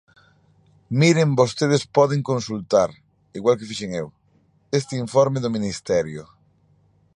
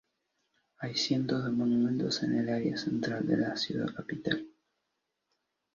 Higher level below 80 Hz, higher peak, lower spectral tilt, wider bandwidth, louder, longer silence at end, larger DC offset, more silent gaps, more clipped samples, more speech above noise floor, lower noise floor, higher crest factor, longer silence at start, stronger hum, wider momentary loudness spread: first, -56 dBFS vs -68 dBFS; first, -2 dBFS vs -16 dBFS; about the same, -6 dB/octave vs -5.5 dB/octave; first, 11 kHz vs 7.4 kHz; first, -21 LUFS vs -31 LUFS; second, 0.9 s vs 1.25 s; neither; neither; neither; second, 40 dB vs 52 dB; second, -61 dBFS vs -83 dBFS; about the same, 20 dB vs 18 dB; about the same, 0.9 s vs 0.8 s; first, 50 Hz at -55 dBFS vs none; first, 12 LU vs 7 LU